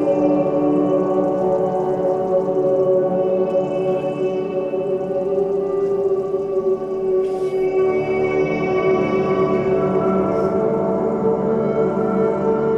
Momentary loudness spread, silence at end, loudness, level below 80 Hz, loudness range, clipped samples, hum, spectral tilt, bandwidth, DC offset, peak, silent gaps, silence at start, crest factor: 4 LU; 0 s; -19 LUFS; -50 dBFS; 2 LU; under 0.1%; none; -9 dB/octave; 7.2 kHz; under 0.1%; -6 dBFS; none; 0 s; 12 dB